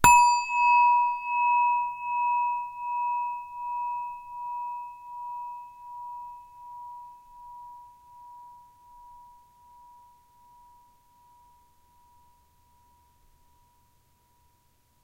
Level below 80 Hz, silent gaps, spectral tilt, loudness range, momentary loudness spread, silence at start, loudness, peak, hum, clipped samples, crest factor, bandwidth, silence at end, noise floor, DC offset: -58 dBFS; none; -1.5 dB/octave; 25 LU; 27 LU; 0 s; -26 LUFS; -2 dBFS; none; under 0.1%; 28 dB; 16 kHz; 5.85 s; -66 dBFS; under 0.1%